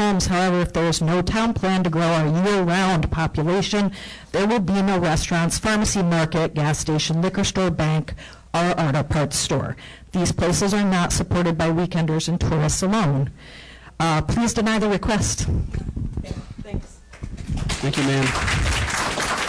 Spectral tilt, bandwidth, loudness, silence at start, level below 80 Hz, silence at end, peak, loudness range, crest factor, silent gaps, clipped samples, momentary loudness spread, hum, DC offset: -5 dB/octave; 11 kHz; -21 LUFS; 0 s; -34 dBFS; 0 s; -14 dBFS; 4 LU; 8 dB; none; under 0.1%; 11 LU; none; under 0.1%